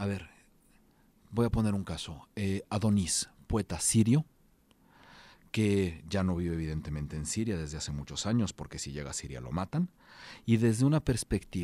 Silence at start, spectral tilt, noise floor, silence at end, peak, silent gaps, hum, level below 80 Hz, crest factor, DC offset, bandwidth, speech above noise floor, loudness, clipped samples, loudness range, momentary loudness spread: 0 s; -5.5 dB/octave; -65 dBFS; 0 s; -14 dBFS; none; none; -50 dBFS; 18 dB; under 0.1%; 15 kHz; 34 dB; -32 LUFS; under 0.1%; 4 LU; 12 LU